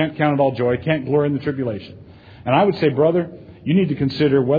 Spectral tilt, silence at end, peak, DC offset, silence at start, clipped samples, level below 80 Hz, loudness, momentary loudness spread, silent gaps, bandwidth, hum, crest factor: -9.5 dB/octave; 0 s; -2 dBFS; under 0.1%; 0 s; under 0.1%; -52 dBFS; -19 LUFS; 14 LU; none; 5 kHz; none; 16 dB